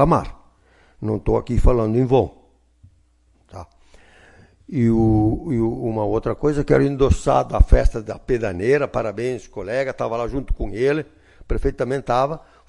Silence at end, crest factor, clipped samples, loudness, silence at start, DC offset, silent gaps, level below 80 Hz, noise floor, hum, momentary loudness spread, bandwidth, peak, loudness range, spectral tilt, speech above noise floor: 0.3 s; 20 dB; under 0.1%; -21 LUFS; 0 s; under 0.1%; none; -26 dBFS; -58 dBFS; none; 11 LU; 11 kHz; 0 dBFS; 5 LU; -8 dB/octave; 40 dB